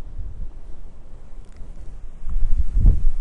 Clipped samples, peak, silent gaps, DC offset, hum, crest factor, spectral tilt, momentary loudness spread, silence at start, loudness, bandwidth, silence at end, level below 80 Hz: under 0.1%; -4 dBFS; none; under 0.1%; none; 14 dB; -9 dB/octave; 25 LU; 0 s; -25 LUFS; 1.3 kHz; 0 s; -22 dBFS